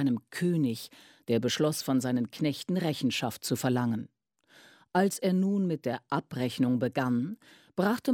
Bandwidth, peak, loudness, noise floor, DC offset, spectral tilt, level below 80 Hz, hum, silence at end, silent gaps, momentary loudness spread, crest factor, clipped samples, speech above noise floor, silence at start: 17.5 kHz; -12 dBFS; -30 LUFS; -62 dBFS; under 0.1%; -5.5 dB/octave; -72 dBFS; none; 0 s; none; 9 LU; 18 dB; under 0.1%; 33 dB; 0 s